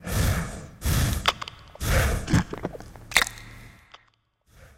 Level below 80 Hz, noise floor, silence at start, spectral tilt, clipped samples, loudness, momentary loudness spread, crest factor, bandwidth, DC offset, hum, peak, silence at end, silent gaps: -34 dBFS; -65 dBFS; 0 s; -4 dB/octave; under 0.1%; -26 LUFS; 15 LU; 26 dB; 17 kHz; under 0.1%; none; 0 dBFS; 0.1 s; none